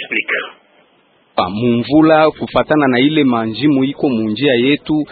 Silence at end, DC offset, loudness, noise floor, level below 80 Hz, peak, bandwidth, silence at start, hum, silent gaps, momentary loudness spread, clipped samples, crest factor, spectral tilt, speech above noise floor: 0.05 s; under 0.1%; -14 LUFS; -54 dBFS; -50 dBFS; 0 dBFS; 4.7 kHz; 0 s; none; none; 8 LU; under 0.1%; 14 dB; -9.5 dB/octave; 40 dB